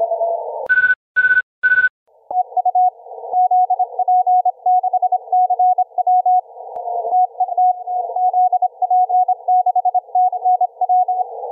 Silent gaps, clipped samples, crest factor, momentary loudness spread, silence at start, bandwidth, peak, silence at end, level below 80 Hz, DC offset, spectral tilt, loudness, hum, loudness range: 0.96-1.15 s, 1.43-1.62 s, 1.90-2.06 s; under 0.1%; 12 dB; 8 LU; 0 s; 3.8 kHz; -6 dBFS; 0 s; -70 dBFS; under 0.1%; -4.5 dB/octave; -16 LUFS; none; 1 LU